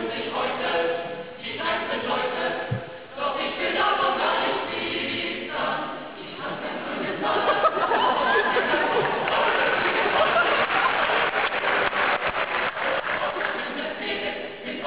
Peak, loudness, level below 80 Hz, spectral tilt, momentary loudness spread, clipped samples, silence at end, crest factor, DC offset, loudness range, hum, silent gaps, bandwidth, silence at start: -8 dBFS; -24 LUFS; -58 dBFS; -7.5 dB/octave; 10 LU; under 0.1%; 0 s; 16 dB; 0.2%; 6 LU; none; none; 4 kHz; 0 s